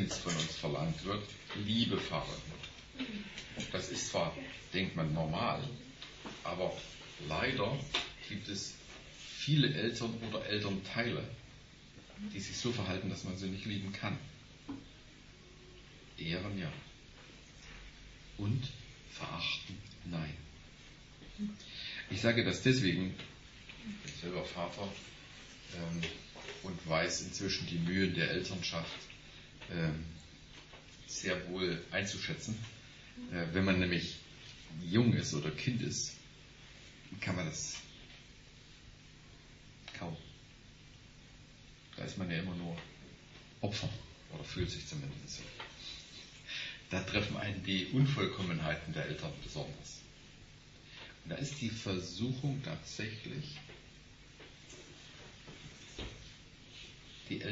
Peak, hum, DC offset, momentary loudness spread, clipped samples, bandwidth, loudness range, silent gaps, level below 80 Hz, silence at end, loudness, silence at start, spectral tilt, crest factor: -16 dBFS; none; under 0.1%; 22 LU; under 0.1%; 8 kHz; 10 LU; none; -58 dBFS; 0 s; -38 LUFS; 0 s; -4 dB/octave; 24 dB